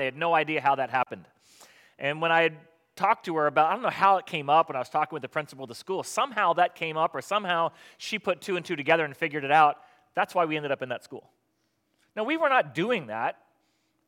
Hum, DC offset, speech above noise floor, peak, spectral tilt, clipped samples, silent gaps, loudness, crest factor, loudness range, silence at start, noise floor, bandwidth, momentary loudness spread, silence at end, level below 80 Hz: none; under 0.1%; 48 dB; -6 dBFS; -4.5 dB/octave; under 0.1%; none; -26 LUFS; 20 dB; 4 LU; 0 s; -74 dBFS; 16.5 kHz; 11 LU; 0.75 s; -82 dBFS